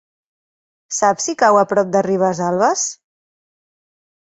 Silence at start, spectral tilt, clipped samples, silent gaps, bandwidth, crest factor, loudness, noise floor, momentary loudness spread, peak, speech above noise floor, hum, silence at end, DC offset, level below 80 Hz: 0.9 s; -4 dB/octave; under 0.1%; none; 8.2 kHz; 18 dB; -16 LUFS; under -90 dBFS; 7 LU; 0 dBFS; over 74 dB; none; 1.3 s; under 0.1%; -64 dBFS